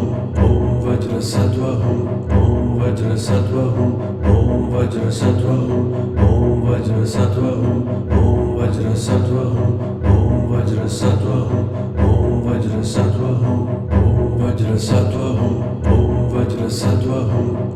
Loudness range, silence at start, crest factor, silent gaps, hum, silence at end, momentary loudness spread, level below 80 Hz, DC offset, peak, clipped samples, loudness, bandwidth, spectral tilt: 1 LU; 0 s; 14 dB; none; none; 0 s; 4 LU; -28 dBFS; under 0.1%; -2 dBFS; under 0.1%; -17 LUFS; 12 kHz; -8 dB/octave